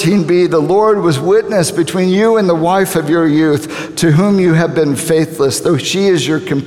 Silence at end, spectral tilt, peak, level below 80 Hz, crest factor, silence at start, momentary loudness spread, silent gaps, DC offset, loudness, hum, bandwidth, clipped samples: 0 s; -5.5 dB/octave; 0 dBFS; -50 dBFS; 10 dB; 0 s; 4 LU; none; 0.2%; -12 LUFS; none; 16.5 kHz; under 0.1%